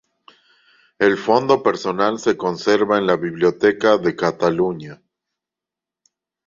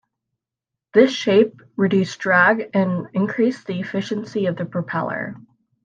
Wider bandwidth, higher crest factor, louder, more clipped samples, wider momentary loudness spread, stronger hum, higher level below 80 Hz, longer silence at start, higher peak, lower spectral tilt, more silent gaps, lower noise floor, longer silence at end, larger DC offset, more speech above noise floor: about the same, 7.6 kHz vs 7.6 kHz; about the same, 18 dB vs 18 dB; about the same, -18 LUFS vs -20 LUFS; neither; second, 5 LU vs 10 LU; neither; first, -60 dBFS vs -68 dBFS; about the same, 1 s vs 0.95 s; about the same, -2 dBFS vs -2 dBFS; about the same, -5.5 dB/octave vs -6.5 dB/octave; neither; about the same, -87 dBFS vs -86 dBFS; first, 1.5 s vs 0.45 s; neither; first, 70 dB vs 66 dB